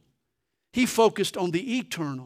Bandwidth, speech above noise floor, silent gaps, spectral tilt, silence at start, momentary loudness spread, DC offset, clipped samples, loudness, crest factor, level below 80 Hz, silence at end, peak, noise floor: 16 kHz; 56 dB; none; -4.5 dB/octave; 0.75 s; 10 LU; under 0.1%; under 0.1%; -25 LUFS; 20 dB; -64 dBFS; 0 s; -8 dBFS; -81 dBFS